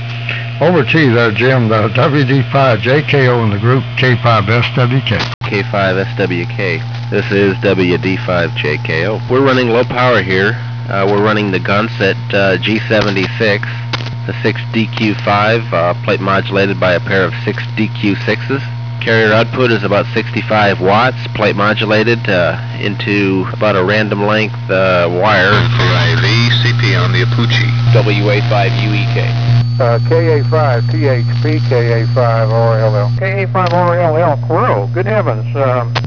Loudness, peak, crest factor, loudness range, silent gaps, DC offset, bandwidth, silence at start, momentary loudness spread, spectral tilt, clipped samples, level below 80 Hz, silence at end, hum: -12 LUFS; 0 dBFS; 12 dB; 3 LU; 5.34-5.41 s; 0.9%; 5.4 kHz; 0 s; 6 LU; -7 dB/octave; under 0.1%; -42 dBFS; 0 s; none